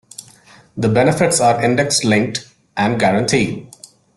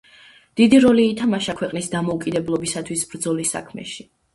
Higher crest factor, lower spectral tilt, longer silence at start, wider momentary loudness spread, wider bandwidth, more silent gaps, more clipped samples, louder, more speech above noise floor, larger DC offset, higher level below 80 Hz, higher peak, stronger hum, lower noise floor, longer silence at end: about the same, 14 dB vs 18 dB; about the same, -4.5 dB/octave vs -4.5 dB/octave; second, 0.2 s vs 0.55 s; second, 16 LU vs 19 LU; about the same, 12.5 kHz vs 12 kHz; neither; neither; first, -16 LUFS vs -19 LUFS; about the same, 31 dB vs 30 dB; neither; about the same, -50 dBFS vs -54 dBFS; about the same, -2 dBFS vs -2 dBFS; neither; about the same, -46 dBFS vs -49 dBFS; first, 0.5 s vs 0.35 s